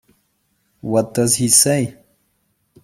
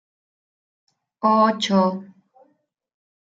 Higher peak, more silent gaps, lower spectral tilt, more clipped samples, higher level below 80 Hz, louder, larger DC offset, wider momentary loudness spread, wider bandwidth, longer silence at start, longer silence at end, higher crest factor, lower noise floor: first, 0 dBFS vs -4 dBFS; neither; second, -3.5 dB/octave vs -5.5 dB/octave; neither; first, -56 dBFS vs -74 dBFS; first, -15 LUFS vs -19 LUFS; neither; first, 14 LU vs 7 LU; first, 16.5 kHz vs 7.8 kHz; second, 0.85 s vs 1.25 s; second, 0.95 s vs 1.2 s; about the same, 20 dB vs 20 dB; about the same, -66 dBFS vs -67 dBFS